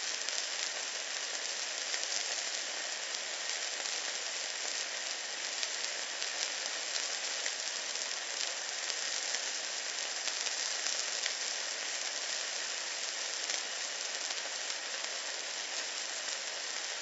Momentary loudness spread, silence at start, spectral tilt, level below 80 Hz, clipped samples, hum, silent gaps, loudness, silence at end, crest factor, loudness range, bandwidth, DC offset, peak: 3 LU; 0 s; 3.5 dB/octave; under -90 dBFS; under 0.1%; none; none; -34 LUFS; 0 s; 26 dB; 2 LU; 8.2 kHz; under 0.1%; -12 dBFS